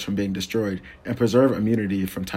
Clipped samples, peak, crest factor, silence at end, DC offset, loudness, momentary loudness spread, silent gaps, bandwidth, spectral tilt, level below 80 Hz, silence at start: under 0.1%; -4 dBFS; 18 dB; 0 s; under 0.1%; -23 LUFS; 10 LU; none; 16.5 kHz; -6.5 dB/octave; -52 dBFS; 0 s